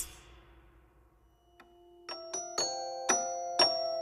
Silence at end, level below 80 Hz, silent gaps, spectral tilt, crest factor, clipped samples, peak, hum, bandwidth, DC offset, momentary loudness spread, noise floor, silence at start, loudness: 0 s; -64 dBFS; none; 0 dB/octave; 24 dB; under 0.1%; -12 dBFS; none; 15.5 kHz; under 0.1%; 17 LU; -65 dBFS; 0 s; -31 LUFS